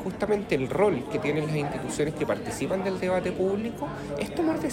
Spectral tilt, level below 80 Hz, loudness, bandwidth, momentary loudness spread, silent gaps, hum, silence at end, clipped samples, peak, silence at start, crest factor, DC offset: -6 dB/octave; -50 dBFS; -28 LUFS; 16 kHz; 6 LU; none; none; 0 s; under 0.1%; -10 dBFS; 0 s; 16 dB; under 0.1%